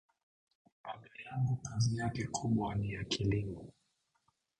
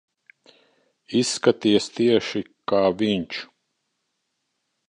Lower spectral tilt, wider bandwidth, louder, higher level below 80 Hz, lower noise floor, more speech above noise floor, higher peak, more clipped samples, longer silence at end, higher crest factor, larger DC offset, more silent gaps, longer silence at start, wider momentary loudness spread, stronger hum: about the same, -5.5 dB/octave vs -4.5 dB/octave; second, 9.6 kHz vs 11 kHz; second, -36 LUFS vs -22 LUFS; first, -56 dBFS vs -62 dBFS; about the same, -79 dBFS vs -76 dBFS; second, 44 dB vs 55 dB; second, -20 dBFS vs -4 dBFS; neither; second, 0.9 s vs 1.45 s; about the same, 18 dB vs 22 dB; neither; neither; second, 0.85 s vs 1.1 s; first, 15 LU vs 11 LU; neither